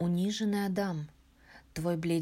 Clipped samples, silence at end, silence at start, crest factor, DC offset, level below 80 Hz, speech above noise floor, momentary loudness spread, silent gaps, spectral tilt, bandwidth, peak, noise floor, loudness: under 0.1%; 0 s; 0 s; 12 dB; under 0.1%; -60 dBFS; 27 dB; 12 LU; none; -6 dB/octave; 16 kHz; -20 dBFS; -58 dBFS; -32 LUFS